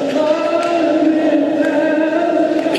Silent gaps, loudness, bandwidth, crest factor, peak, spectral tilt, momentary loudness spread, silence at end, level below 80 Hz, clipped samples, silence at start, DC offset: none; -15 LUFS; 11 kHz; 12 dB; -2 dBFS; -5 dB/octave; 2 LU; 0 s; -66 dBFS; under 0.1%; 0 s; under 0.1%